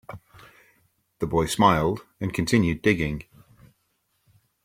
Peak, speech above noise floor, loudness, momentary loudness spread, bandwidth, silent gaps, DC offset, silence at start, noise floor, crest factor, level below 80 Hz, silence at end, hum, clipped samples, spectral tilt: -4 dBFS; 49 dB; -23 LUFS; 16 LU; 16.5 kHz; none; under 0.1%; 0.1 s; -72 dBFS; 22 dB; -48 dBFS; 1.4 s; none; under 0.1%; -5.5 dB/octave